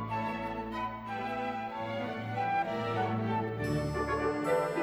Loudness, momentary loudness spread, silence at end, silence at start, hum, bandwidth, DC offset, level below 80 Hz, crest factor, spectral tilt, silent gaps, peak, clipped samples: -34 LUFS; 6 LU; 0 s; 0 s; none; over 20 kHz; under 0.1%; -52 dBFS; 14 dB; -6.5 dB/octave; none; -18 dBFS; under 0.1%